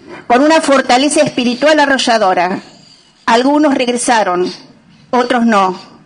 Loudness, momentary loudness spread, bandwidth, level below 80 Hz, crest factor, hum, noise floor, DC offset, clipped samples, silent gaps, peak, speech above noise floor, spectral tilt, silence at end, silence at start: -12 LUFS; 8 LU; 11 kHz; -54 dBFS; 12 dB; none; -44 dBFS; under 0.1%; under 0.1%; none; -2 dBFS; 33 dB; -3 dB/octave; 0.25 s; 0.1 s